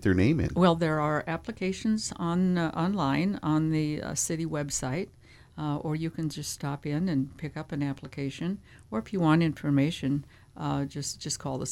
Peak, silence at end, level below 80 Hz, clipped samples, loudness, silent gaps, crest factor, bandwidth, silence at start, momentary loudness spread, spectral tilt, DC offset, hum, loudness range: -8 dBFS; 0 s; -52 dBFS; under 0.1%; -29 LUFS; none; 20 dB; 15 kHz; 0 s; 11 LU; -5.5 dB/octave; under 0.1%; none; 5 LU